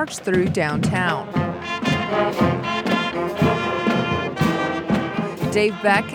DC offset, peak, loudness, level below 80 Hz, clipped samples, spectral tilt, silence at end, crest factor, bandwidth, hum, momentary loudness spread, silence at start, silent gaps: under 0.1%; -4 dBFS; -21 LUFS; -48 dBFS; under 0.1%; -5.5 dB/octave; 0 s; 18 dB; 18 kHz; none; 5 LU; 0 s; none